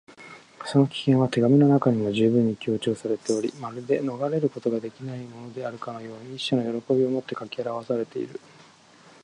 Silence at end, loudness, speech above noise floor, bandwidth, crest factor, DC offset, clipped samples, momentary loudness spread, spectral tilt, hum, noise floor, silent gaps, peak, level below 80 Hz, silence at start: 0.9 s; -25 LUFS; 29 dB; 10.5 kHz; 18 dB; under 0.1%; under 0.1%; 17 LU; -7 dB/octave; none; -53 dBFS; none; -6 dBFS; -66 dBFS; 0.1 s